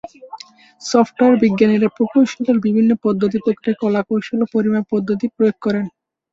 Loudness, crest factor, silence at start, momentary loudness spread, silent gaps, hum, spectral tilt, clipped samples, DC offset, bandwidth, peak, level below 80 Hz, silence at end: -17 LUFS; 16 dB; 0.05 s; 11 LU; none; none; -6.5 dB/octave; under 0.1%; under 0.1%; 7.8 kHz; -2 dBFS; -58 dBFS; 0.45 s